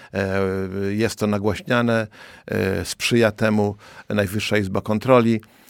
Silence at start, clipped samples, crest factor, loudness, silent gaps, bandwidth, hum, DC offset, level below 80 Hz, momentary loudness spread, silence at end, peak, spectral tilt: 0 s; under 0.1%; 18 dB; -21 LUFS; none; 17.5 kHz; none; under 0.1%; -52 dBFS; 9 LU; 0.3 s; -2 dBFS; -5.5 dB/octave